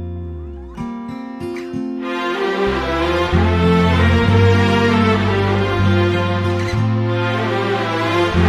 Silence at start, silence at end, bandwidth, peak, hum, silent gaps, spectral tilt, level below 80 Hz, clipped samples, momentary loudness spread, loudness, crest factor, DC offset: 0 s; 0 s; 11 kHz; -2 dBFS; none; none; -7 dB/octave; -32 dBFS; under 0.1%; 15 LU; -16 LUFS; 14 dB; under 0.1%